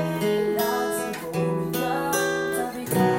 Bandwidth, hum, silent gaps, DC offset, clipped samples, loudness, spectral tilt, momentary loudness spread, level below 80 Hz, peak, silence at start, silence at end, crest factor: 17 kHz; none; none; under 0.1%; under 0.1%; -25 LUFS; -5 dB/octave; 4 LU; -58 dBFS; -10 dBFS; 0 s; 0 s; 16 dB